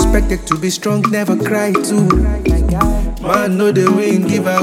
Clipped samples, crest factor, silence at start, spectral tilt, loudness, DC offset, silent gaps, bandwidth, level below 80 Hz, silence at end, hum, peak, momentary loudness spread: under 0.1%; 14 dB; 0 s; -6 dB/octave; -15 LUFS; under 0.1%; none; 16.5 kHz; -20 dBFS; 0 s; none; 0 dBFS; 4 LU